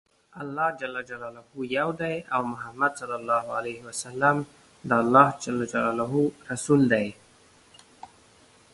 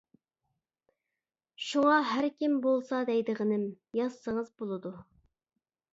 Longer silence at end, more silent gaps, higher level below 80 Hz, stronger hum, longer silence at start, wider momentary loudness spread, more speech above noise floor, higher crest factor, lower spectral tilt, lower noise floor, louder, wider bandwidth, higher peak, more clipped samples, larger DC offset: second, 0.65 s vs 0.9 s; neither; first, -64 dBFS vs -74 dBFS; neither; second, 0.35 s vs 1.6 s; first, 16 LU vs 12 LU; second, 31 dB vs 60 dB; first, 26 dB vs 18 dB; about the same, -5.5 dB/octave vs -5.5 dB/octave; second, -57 dBFS vs -90 dBFS; first, -26 LUFS vs -30 LUFS; first, 11.5 kHz vs 7.8 kHz; first, -2 dBFS vs -14 dBFS; neither; neither